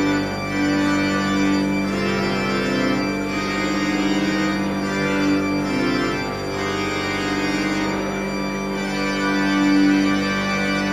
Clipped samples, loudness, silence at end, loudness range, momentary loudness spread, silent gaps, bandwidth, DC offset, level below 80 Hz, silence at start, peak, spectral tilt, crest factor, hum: under 0.1%; -21 LUFS; 0 s; 2 LU; 5 LU; none; 16 kHz; under 0.1%; -42 dBFS; 0 s; -6 dBFS; -5 dB/octave; 14 dB; none